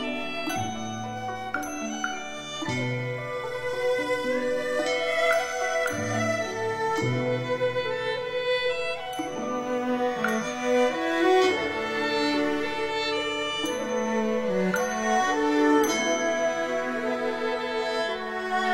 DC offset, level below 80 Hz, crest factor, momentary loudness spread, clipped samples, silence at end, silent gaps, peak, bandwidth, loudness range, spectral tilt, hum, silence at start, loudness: under 0.1%; -60 dBFS; 16 dB; 8 LU; under 0.1%; 0 s; none; -10 dBFS; 16.5 kHz; 4 LU; -4 dB/octave; none; 0 s; -27 LUFS